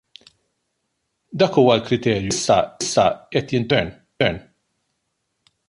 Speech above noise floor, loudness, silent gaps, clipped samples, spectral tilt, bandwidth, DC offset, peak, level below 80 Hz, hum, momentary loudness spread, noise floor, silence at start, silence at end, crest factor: 55 dB; -19 LUFS; none; under 0.1%; -4.5 dB/octave; 11.5 kHz; under 0.1%; -2 dBFS; -50 dBFS; none; 8 LU; -74 dBFS; 1.3 s; 1.3 s; 18 dB